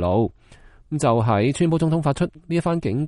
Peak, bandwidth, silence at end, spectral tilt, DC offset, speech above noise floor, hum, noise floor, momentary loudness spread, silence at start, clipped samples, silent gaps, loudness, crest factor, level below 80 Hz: -6 dBFS; 11.5 kHz; 0 s; -7 dB/octave; under 0.1%; 28 dB; none; -48 dBFS; 6 LU; 0 s; under 0.1%; none; -21 LUFS; 14 dB; -46 dBFS